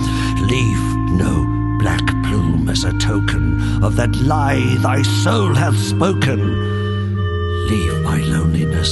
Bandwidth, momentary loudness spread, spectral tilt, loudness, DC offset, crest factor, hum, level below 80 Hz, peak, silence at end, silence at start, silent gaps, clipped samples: 12 kHz; 4 LU; -6 dB/octave; -17 LUFS; under 0.1%; 14 dB; none; -26 dBFS; -2 dBFS; 0 s; 0 s; none; under 0.1%